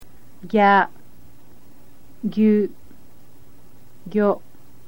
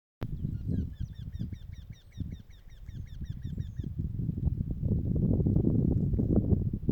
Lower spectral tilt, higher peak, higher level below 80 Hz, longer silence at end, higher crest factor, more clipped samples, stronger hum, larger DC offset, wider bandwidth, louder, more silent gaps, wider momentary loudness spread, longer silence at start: second, -7.5 dB/octave vs -11 dB/octave; first, -4 dBFS vs -12 dBFS; second, -60 dBFS vs -38 dBFS; first, 0.5 s vs 0 s; about the same, 20 dB vs 18 dB; neither; neither; first, 2% vs under 0.1%; first, 16.5 kHz vs 6.2 kHz; first, -20 LUFS vs -32 LUFS; neither; second, 13 LU vs 18 LU; second, 0 s vs 0.2 s